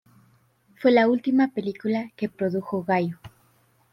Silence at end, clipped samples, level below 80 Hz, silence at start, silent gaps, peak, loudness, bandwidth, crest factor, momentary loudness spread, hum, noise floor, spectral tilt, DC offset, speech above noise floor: 0.65 s; under 0.1%; -68 dBFS; 0.8 s; none; -8 dBFS; -24 LUFS; 6 kHz; 16 dB; 11 LU; none; -62 dBFS; -8 dB/octave; under 0.1%; 40 dB